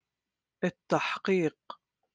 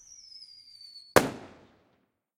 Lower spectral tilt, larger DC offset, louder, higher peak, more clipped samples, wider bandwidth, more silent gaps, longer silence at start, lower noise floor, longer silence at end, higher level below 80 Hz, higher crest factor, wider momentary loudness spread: first, -6 dB/octave vs -3.5 dB/octave; neither; second, -30 LUFS vs -26 LUFS; second, -12 dBFS vs -2 dBFS; neither; second, 9.4 kHz vs 16 kHz; neither; second, 0.6 s vs 1.15 s; first, -89 dBFS vs -72 dBFS; second, 0.4 s vs 1 s; second, -76 dBFS vs -62 dBFS; second, 22 dB vs 32 dB; about the same, 21 LU vs 22 LU